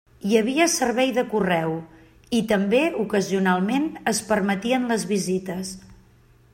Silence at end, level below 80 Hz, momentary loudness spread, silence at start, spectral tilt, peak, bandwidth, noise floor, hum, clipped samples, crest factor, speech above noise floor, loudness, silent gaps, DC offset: 0.6 s; -56 dBFS; 8 LU; 0.25 s; -4.5 dB/octave; -6 dBFS; 16.5 kHz; -54 dBFS; none; under 0.1%; 18 dB; 32 dB; -22 LUFS; none; under 0.1%